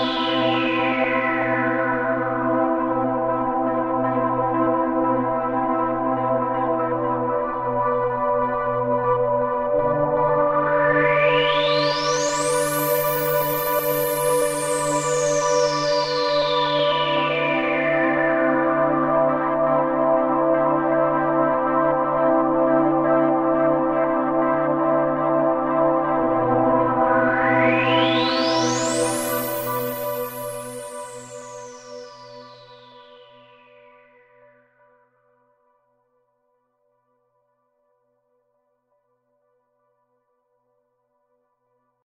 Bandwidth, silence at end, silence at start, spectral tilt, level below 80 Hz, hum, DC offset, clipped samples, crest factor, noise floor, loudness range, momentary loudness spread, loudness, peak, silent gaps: 16 kHz; 9.05 s; 0 s; -4.5 dB/octave; -52 dBFS; none; under 0.1%; under 0.1%; 16 dB; -70 dBFS; 4 LU; 5 LU; -20 LUFS; -6 dBFS; none